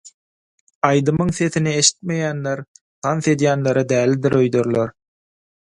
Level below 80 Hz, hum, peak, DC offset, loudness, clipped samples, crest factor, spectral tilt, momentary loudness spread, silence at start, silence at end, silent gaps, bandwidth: -52 dBFS; none; 0 dBFS; under 0.1%; -19 LUFS; under 0.1%; 20 dB; -4.5 dB/octave; 9 LU; 0.05 s; 0.75 s; 0.14-0.67 s, 0.75-0.81 s, 2.68-2.75 s, 2.81-3.02 s; 11.5 kHz